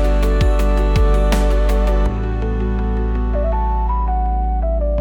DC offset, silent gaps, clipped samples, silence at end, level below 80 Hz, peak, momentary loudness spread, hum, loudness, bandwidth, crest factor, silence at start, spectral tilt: under 0.1%; none; under 0.1%; 0 s; -16 dBFS; -6 dBFS; 4 LU; none; -19 LUFS; 10 kHz; 10 dB; 0 s; -7 dB/octave